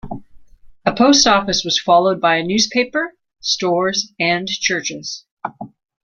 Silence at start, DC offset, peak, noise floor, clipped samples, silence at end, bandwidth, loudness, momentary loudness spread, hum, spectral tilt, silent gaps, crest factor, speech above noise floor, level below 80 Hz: 0.05 s; under 0.1%; 0 dBFS; -42 dBFS; under 0.1%; 0.35 s; 11 kHz; -16 LUFS; 18 LU; none; -2.5 dB/octave; 5.31-5.37 s; 18 dB; 26 dB; -50 dBFS